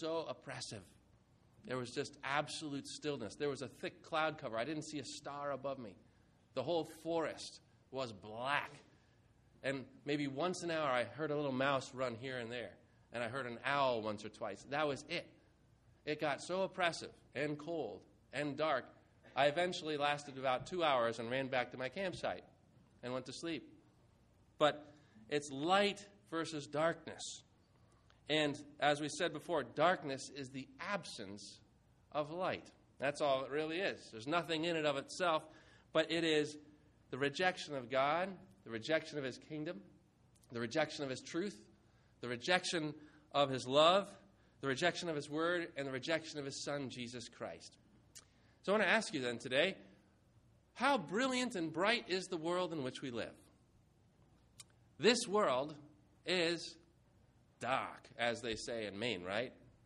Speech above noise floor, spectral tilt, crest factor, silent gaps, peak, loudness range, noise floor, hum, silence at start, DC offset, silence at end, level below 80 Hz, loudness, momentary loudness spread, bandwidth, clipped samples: 31 dB; -4 dB/octave; 24 dB; none; -16 dBFS; 6 LU; -70 dBFS; none; 0 s; under 0.1%; 0.15 s; -76 dBFS; -39 LUFS; 13 LU; 11.5 kHz; under 0.1%